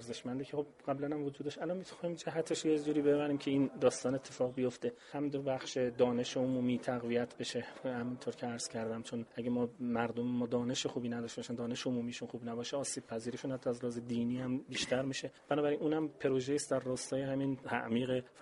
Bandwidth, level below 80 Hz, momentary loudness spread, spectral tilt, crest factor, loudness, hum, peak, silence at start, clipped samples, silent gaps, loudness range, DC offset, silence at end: 11.5 kHz; -72 dBFS; 8 LU; -5 dB/octave; 20 dB; -37 LUFS; none; -16 dBFS; 0 s; under 0.1%; none; 4 LU; under 0.1%; 0 s